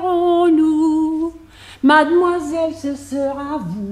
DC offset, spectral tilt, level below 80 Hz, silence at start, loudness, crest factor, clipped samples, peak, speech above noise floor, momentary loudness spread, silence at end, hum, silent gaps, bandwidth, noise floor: under 0.1%; -5.5 dB/octave; -50 dBFS; 0 s; -17 LUFS; 16 dB; under 0.1%; 0 dBFS; 23 dB; 12 LU; 0 s; none; none; 11.5 kHz; -40 dBFS